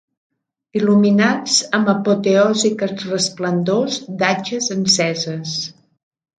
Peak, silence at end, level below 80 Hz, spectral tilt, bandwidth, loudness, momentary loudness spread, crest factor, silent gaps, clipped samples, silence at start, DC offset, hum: -2 dBFS; 0.7 s; -64 dBFS; -4 dB/octave; 9.4 kHz; -17 LUFS; 9 LU; 16 dB; none; under 0.1%; 0.75 s; under 0.1%; none